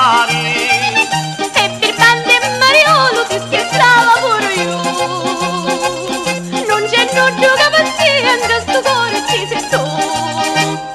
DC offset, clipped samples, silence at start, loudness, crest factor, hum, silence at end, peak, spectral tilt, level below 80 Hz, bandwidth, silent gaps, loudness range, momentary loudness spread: under 0.1%; under 0.1%; 0 s; -12 LUFS; 12 dB; none; 0 s; 0 dBFS; -2.5 dB/octave; -48 dBFS; 15 kHz; none; 4 LU; 8 LU